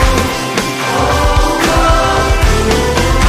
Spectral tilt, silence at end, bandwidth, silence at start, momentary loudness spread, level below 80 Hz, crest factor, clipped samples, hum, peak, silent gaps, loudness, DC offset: -4.5 dB/octave; 0 s; 15.5 kHz; 0 s; 4 LU; -16 dBFS; 10 dB; under 0.1%; none; 0 dBFS; none; -12 LUFS; under 0.1%